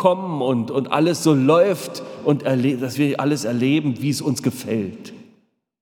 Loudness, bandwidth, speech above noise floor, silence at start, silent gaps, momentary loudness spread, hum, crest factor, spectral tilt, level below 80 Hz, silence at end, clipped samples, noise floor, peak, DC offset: -20 LUFS; 18.5 kHz; 41 dB; 0 s; none; 9 LU; none; 20 dB; -6 dB/octave; -70 dBFS; 0.6 s; under 0.1%; -60 dBFS; 0 dBFS; under 0.1%